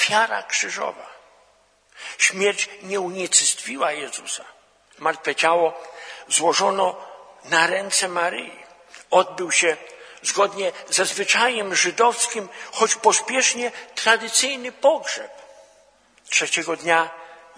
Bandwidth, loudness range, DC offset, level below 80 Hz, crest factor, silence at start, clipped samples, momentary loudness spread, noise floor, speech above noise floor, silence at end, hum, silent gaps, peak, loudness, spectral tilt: 11 kHz; 3 LU; under 0.1%; -74 dBFS; 22 dB; 0 s; under 0.1%; 13 LU; -59 dBFS; 37 dB; 0.2 s; none; none; 0 dBFS; -20 LUFS; -0.5 dB/octave